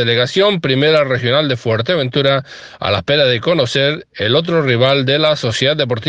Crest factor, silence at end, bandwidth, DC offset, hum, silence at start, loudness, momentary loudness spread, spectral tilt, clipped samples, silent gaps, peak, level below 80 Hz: 14 dB; 0 s; 9.4 kHz; under 0.1%; none; 0 s; -14 LUFS; 5 LU; -5.5 dB/octave; under 0.1%; none; 0 dBFS; -50 dBFS